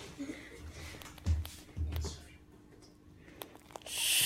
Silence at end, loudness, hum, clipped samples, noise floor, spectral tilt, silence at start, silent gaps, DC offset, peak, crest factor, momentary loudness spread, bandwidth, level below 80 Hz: 0 s; -40 LUFS; none; under 0.1%; -58 dBFS; -2 dB/octave; 0 s; none; under 0.1%; -18 dBFS; 22 dB; 22 LU; 16 kHz; -46 dBFS